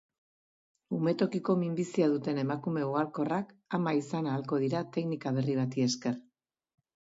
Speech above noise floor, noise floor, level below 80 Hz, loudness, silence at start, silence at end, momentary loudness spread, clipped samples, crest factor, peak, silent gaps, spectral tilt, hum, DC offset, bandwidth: over 59 dB; under -90 dBFS; -76 dBFS; -32 LUFS; 0.9 s; 1 s; 5 LU; under 0.1%; 16 dB; -16 dBFS; none; -6.5 dB/octave; none; under 0.1%; 7.8 kHz